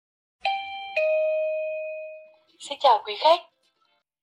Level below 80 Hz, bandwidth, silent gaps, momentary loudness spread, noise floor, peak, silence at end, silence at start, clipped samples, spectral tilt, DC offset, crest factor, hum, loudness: -80 dBFS; 10.5 kHz; none; 16 LU; -71 dBFS; -8 dBFS; 0.8 s; 0.45 s; under 0.1%; -0.5 dB/octave; under 0.1%; 18 dB; none; -24 LUFS